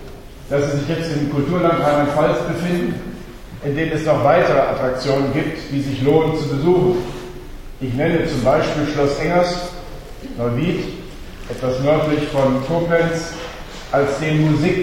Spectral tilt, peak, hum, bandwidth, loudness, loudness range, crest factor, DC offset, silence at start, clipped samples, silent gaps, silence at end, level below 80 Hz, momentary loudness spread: -6.5 dB/octave; -2 dBFS; none; 16.5 kHz; -18 LUFS; 3 LU; 18 dB; under 0.1%; 0 s; under 0.1%; none; 0 s; -36 dBFS; 17 LU